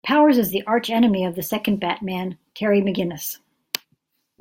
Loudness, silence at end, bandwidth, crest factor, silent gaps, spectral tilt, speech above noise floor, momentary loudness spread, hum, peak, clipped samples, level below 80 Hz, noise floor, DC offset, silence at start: -22 LUFS; 1.05 s; 17 kHz; 22 dB; none; -5 dB/octave; 49 dB; 13 LU; none; 0 dBFS; under 0.1%; -60 dBFS; -69 dBFS; under 0.1%; 0.05 s